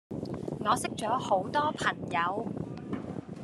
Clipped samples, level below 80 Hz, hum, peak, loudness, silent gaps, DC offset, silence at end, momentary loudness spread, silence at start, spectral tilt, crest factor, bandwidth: under 0.1%; -62 dBFS; none; -12 dBFS; -31 LUFS; none; under 0.1%; 0 s; 10 LU; 0.1 s; -5 dB/octave; 20 dB; 13 kHz